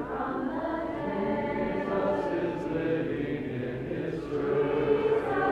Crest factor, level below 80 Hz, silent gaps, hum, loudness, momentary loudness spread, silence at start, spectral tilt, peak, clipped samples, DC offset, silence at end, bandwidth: 16 dB; -52 dBFS; none; none; -30 LUFS; 7 LU; 0 s; -8 dB/octave; -14 dBFS; under 0.1%; under 0.1%; 0 s; 8.2 kHz